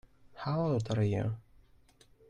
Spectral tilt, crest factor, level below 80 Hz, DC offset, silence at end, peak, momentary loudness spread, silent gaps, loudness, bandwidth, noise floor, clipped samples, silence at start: -8 dB/octave; 16 dB; -60 dBFS; under 0.1%; 0.9 s; -20 dBFS; 10 LU; none; -33 LUFS; 9.6 kHz; -63 dBFS; under 0.1%; 0.3 s